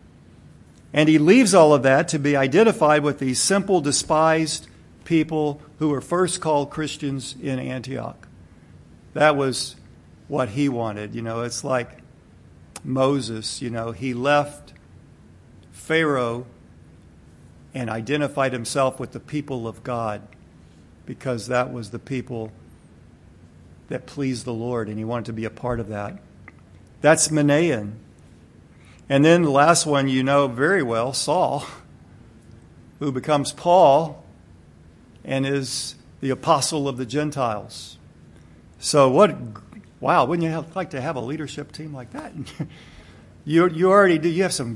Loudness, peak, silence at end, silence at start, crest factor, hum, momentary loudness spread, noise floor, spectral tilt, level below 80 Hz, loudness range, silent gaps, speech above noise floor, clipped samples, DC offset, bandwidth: -21 LUFS; -2 dBFS; 0 s; 0.95 s; 22 dB; none; 18 LU; -49 dBFS; -5 dB/octave; -56 dBFS; 10 LU; none; 28 dB; under 0.1%; under 0.1%; 12 kHz